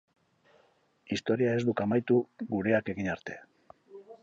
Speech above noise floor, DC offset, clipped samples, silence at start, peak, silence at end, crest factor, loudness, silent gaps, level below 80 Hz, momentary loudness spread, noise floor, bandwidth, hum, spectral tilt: 38 dB; under 0.1%; under 0.1%; 1.1 s; -14 dBFS; 0.1 s; 18 dB; -30 LUFS; none; -64 dBFS; 14 LU; -67 dBFS; 7.8 kHz; none; -7 dB/octave